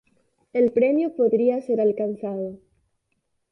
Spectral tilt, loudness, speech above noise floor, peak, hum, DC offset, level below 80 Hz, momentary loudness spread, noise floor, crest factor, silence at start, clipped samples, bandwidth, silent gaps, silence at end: -9.5 dB/octave; -22 LUFS; 52 dB; -8 dBFS; none; under 0.1%; -68 dBFS; 10 LU; -74 dBFS; 14 dB; 0.55 s; under 0.1%; 5.6 kHz; none; 0.95 s